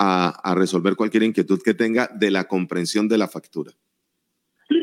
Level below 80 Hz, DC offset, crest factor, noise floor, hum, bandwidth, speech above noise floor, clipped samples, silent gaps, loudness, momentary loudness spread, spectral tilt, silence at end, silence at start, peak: -80 dBFS; under 0.1%; 20 dB; -75 dBFS; none; 15 kHz; 55 dB; under 0.1%; none; -21 LUFS; 9 LU; -5.5 dB/octave; 0 s; 0 s; -2 dBFS